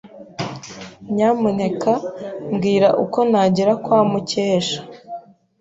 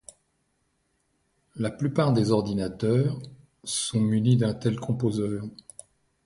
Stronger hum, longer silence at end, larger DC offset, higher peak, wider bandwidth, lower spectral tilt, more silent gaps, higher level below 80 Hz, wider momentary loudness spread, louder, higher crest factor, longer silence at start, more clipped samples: neither; second, 0.4 s vs 0.7 s; neither; first, -4 dBFS vs -10 dBFS; second, 8 kHz vs 11.5 kHz; about the same, -6 dB/octave vs -6.5 dB/octave; neither; about the same, -58 dBFS vs -56 dBFS; about the same, 19 LU vs 17 LU; first, -19 LUFS vs -26 LUFS; about the same, 16 dB vs 18 dB; second, 0.05 s vs 1.55 s; neither